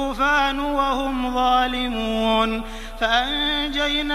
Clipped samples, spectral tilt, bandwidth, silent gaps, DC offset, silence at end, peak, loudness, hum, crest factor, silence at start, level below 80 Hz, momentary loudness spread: under 0.1%; -3.5 dB/octave; 15.5 kHz; none; under 0.1%; 0 s; -4 dBFS; -21 LUFS; none; 16 dB; 0 s; -34 dBFS; 5 LU